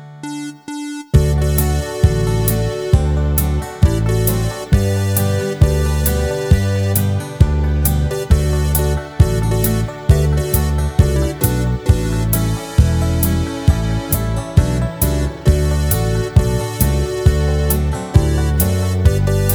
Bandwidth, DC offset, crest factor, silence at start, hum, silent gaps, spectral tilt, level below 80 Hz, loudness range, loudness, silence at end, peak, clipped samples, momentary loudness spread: over 20 kHz; under 0.1%; 14 dB; 0 s; none; none; -6 dB/octave; -20 dBFS; 1 LU; -16 LUFS; 0 s; 0 dBFS; under 0.1%; 4 LU